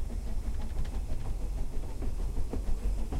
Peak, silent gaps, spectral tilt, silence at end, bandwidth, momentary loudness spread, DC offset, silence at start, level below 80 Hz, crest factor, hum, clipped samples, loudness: -18 dBFS; none; -6.5 dB/octave; 0 s; 12 kHz; 3 LU; under 0.1%; 0 s; -32 dBFS; 12 dB; none; under 0.1%; -38 LUFS